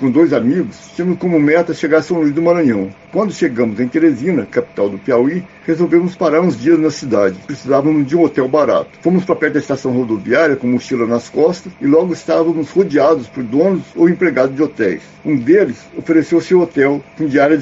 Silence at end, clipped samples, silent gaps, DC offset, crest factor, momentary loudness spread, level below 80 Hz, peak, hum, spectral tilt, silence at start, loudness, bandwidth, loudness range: 0 s; under 0.1%; none; under 0.1%; 12 dB; 7 LU; -54 dBFS; 0 dBFS; none; -6.5 dB/octave; 0 s; -14 LUFS; 7.8 kHz; 1 LU